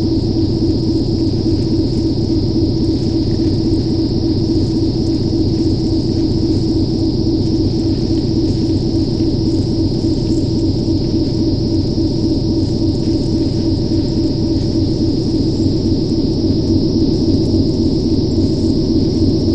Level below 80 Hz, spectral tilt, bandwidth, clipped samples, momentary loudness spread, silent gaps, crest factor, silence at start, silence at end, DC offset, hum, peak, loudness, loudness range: -26 dBFS; -8 dB/octave; 8.8 kHz; under 0.1%; 2 LU; none; 12 dB; 0 s; 0 s; under 0.1%; none; -2 dBFS; -16 LUFS; 1 LU